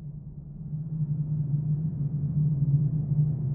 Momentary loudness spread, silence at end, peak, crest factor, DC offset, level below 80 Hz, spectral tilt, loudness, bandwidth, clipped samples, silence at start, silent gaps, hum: 15 LU; 0 s; -14 dBFS; 14 dB; under 0.1%; -48 dBFS; -17 dB/octave; -28 LUFS; 1.1 kHz; under 0.1%; 0 s; none; none